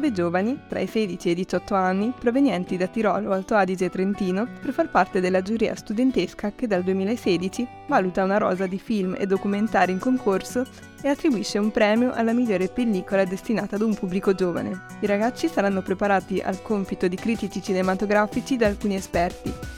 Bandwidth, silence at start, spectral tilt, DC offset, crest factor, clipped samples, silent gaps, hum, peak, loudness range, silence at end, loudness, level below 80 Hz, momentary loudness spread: 15.5 kHz; 0 s; -6 dB/octave; under 0.1%; 18 dB; under 0.1%; none; none; -6 dBFS; 1 LU; 0 s; -24 LUFS; -48 dBFS; 6 LU